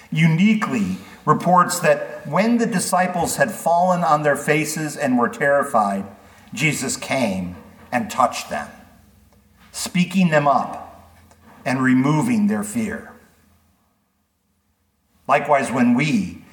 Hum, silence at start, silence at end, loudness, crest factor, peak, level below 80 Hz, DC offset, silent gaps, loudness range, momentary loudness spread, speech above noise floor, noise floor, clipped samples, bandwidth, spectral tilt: none; 0.1 s; 0.1 s; -19 LUFS; 18 dB; -2 dBFS; -58 dBFS; under 0.1%; none; 6 LU; 12 LU; 49 dB; -67 dBFS; under 0.1%; 19 kHz; -5.5 dB/octave